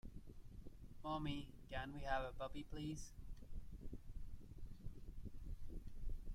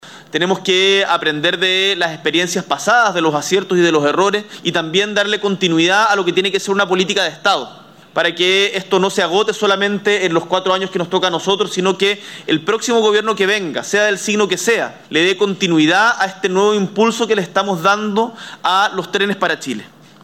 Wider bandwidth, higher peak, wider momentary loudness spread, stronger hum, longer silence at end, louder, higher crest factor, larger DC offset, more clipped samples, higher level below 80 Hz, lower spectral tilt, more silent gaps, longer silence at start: second, 13.5 kHz vs 16 kHz; second, -28 dBFS vs -2 dBFS; first, 15 LU vs 6 LU; neither; second, 0 s vs 0.4 s; second, -52 LUFS vs -15 LUFS; first, 20 dB vs 14 dB; second, under 0.1% vs 0.1%; neither; first, -52 dBFS vs -66 dBFS; first, -5.5 dB/octave vs -3.5 dB/octave; neither; about the same, 0.05 s vs 0.05 s